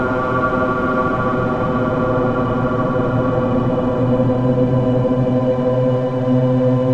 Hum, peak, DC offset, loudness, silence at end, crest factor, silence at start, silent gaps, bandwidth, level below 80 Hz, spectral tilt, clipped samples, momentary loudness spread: none; -4 dBFS; under 0.1%; -17 LUFS; 0 s; 12 dB; 0 s; none; 6.8 kHz; -36 dBFS; -9.5 dB/octave; under 0.1%; 2 LU